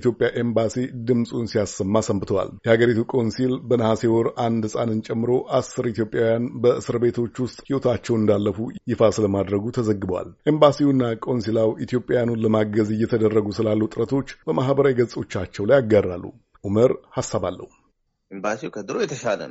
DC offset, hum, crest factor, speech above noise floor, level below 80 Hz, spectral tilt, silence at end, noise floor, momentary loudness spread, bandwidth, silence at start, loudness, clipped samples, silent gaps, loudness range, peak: under 0.1%; none; 20 dB; 46 dB; -54 dBFS; -6.5 dB/octave; 0 s; -67 dBFS; 8 LU; 8 kHz; 0 s; -22 LUFS; under 0.1%; none; 2 LU; -2 dBFS